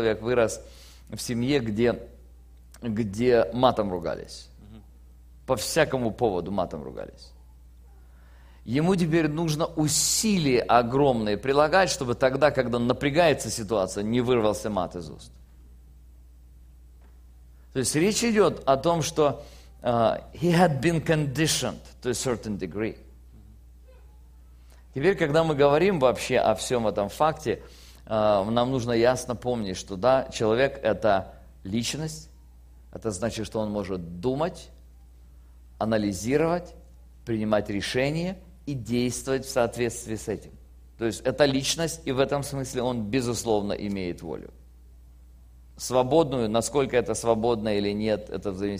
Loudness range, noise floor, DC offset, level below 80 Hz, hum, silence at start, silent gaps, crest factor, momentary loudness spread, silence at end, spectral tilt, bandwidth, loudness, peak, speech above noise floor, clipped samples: 7 LU; -50 dBFS; under 0.1%; -48 dBFS; none; 0 s; none; 22 dB; 13 LU; 0 s; -4.5 dB/octave; 15.5 kHz; -25 LUFS; -4 dBFS; 25 dB; under 0.1%